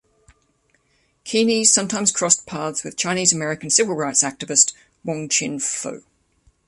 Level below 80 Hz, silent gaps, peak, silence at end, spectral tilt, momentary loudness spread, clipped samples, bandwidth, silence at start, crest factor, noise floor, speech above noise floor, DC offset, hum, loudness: -62 dBFS; none; 0 dBFS; 0.7 s; -2 dB/octave; 12 LU; under 0.1%; 11.5 kHz; 1.25 s; 22 dB; -64 dBFS; 44 dB; under 0.1%; none; -18 LUFS